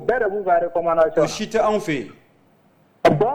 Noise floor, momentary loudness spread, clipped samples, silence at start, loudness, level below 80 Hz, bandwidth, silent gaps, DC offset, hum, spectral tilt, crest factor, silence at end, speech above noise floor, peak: -57 dBFS; 8 LU; under 0.1%; 0 s; -20 LUFS; -50 dBFS; 13.5 kHz; none; under 0.1%; none; -5.5 dB/octave; 16 dB; 0 s; 37 dB; -4 dBFS